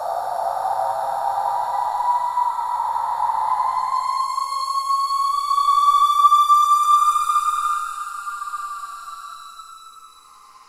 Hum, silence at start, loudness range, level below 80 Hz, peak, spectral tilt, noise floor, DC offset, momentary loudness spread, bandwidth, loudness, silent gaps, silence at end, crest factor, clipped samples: none; 0 s; 6 LU; -62 dBFS; -4 dBFS; 0.5 dB/octave; -47 dBFS; under 0.1%; 17 LU; 16 kHz; -19 LUFS; none; 0.6 s; 18 dB; under 0.1%